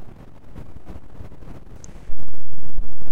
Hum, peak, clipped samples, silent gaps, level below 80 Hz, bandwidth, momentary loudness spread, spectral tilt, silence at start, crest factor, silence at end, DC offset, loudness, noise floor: none; -6 dBFS; under 0.1%; none; -34 dBFS; 7.8 kHz; 6 LU; -7 dB/octave; 0 s; 4 dB; 0 s; under 0.1%; -42 LUFS; -41 dBFS